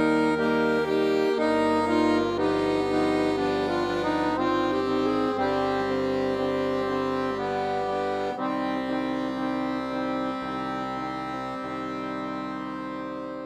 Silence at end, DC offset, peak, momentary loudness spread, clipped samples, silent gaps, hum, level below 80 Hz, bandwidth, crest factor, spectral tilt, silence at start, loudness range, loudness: 0 s; under 0.1%; -10 dBFS; 9 LU; under 0.1%; none; 50 Hz at -70 dBFS; -54 dBFS; 12.5 kHz; 16 dB; -6 dB/octave; 0 s; 6 LU; -26 LUFS